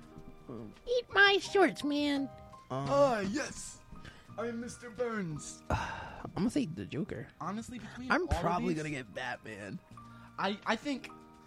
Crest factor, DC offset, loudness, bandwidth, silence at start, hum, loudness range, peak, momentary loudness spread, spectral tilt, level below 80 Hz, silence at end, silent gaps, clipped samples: 20 dB; under 0.1%; -33 LUFS; 14.5 kHz; 0 s; none; 8 LU; -14 dBFS; 20 LU; -4.5 dB/octave; -52 dBFS; 0.05 s; none; under 0.1%